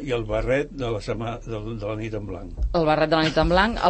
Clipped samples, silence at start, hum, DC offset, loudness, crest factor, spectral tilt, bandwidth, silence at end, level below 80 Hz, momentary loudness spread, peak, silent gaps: under 0.1%; 0 s; none; under 0.1%; -24 LUFS; 18 dB; -6 dB/octave; 8.8 kHz; 0 s; -34 dBFS; 12 LU; -4 dBFS; none